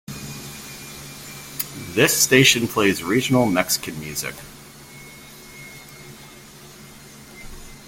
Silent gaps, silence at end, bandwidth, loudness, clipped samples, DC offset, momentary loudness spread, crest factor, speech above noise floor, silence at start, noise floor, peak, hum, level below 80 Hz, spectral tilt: none; 0 s; 17 kHz; -18 LUFS; under 0.1%; under 0.1%; 27 LU; 24 dB; 24 dB; 0.1 s; -43 dBFS; 0 dBFS; none; -50 dBFS; -3 dB/octave